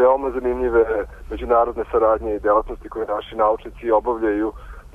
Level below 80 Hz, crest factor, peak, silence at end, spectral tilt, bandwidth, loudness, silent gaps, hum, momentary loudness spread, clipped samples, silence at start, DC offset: -38 dBFS; 14 dB; -6 dBFS; 0.05 s; -8 dB/octave; 3.8 kHz; -20 LUFS; none; none; 10 LU; under 0.1%; 0 s; under 0.1%